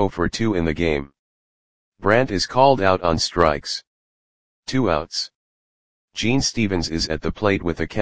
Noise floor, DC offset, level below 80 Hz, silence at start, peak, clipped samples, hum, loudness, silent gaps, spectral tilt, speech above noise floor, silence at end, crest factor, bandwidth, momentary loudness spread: under -90 dBFS; 2%; -40 dBFS; 0 s; 0 dBFS; under 0.1%; none; -21 LUFS; 1.19-1.92 s, 3.87-4.63 s, 5.35-6.08 s; -4.5 dB/octave; over 70 dB; 0 s; 22 dB; 10 kHz; 10 LU